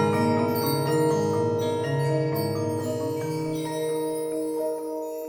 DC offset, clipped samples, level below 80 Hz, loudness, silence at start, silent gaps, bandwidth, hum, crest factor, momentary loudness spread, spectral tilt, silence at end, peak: under 0.1%; under 0.1%; -64 dBFS; -26 LUFS; 0 s; none; over 20 kHz; none; 14 dB; 6 LU; -6.5 dB/octave; 0 s; -12 dBFS